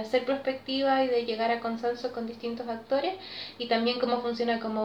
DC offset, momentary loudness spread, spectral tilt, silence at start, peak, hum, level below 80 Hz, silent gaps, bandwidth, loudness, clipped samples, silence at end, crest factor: under 0.1%; 9 LU; -5 dB/octave; 0 s; -14 dBFS; none; -72 dBFS; none; 8.8 kHz; -29 LUFS; under 0.1%; 0 s; 16 dB